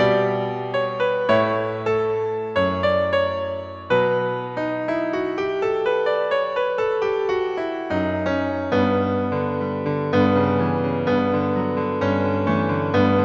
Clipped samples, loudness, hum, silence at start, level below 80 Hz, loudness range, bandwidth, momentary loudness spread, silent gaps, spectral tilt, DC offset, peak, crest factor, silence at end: under 0.1%; -22 LUFS; none; 0 s; -56 dBFS; 2 LU; 7.4 kHz; 6 LU; none; -8 dB/octave; under 0.1%; -6 dBFS; 16 dB; 0 s